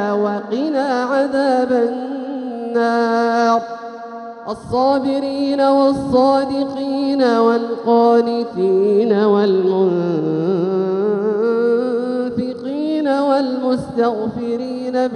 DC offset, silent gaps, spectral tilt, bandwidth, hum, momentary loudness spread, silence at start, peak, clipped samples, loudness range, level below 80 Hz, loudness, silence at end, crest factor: under 0.1%; none; -7 dB/octave; 10.5 kHz; none; 9 LU; 0 s; -2 dBFS; under 0.1%; 3 LU; -54 dBFS; -17 LUFS; 0 s; 14 dB